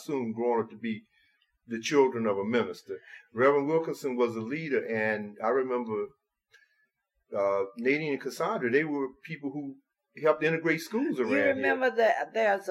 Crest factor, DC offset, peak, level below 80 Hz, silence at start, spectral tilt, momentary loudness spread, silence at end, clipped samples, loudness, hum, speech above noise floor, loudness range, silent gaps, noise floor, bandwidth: 20 dB; under 0.1%; -10 dBFS; -82 dBFS; 0 s; -5.5 dB/octave; 12 LU; 0 s; under 0.1%; -29 LUFS; none; 47 dB; 4 LU; none; -76 dBFS; 15 kHz